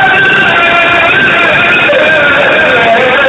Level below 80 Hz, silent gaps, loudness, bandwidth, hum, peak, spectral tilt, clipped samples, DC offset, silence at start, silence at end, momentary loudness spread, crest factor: -40 dBFS; none; -5 LUFS; 11 kHz; none; 0 dBFS; -4.5 dB/octave; 0.6%; under 0.1%; 0 s; 0 s; 1 LU; 6 dB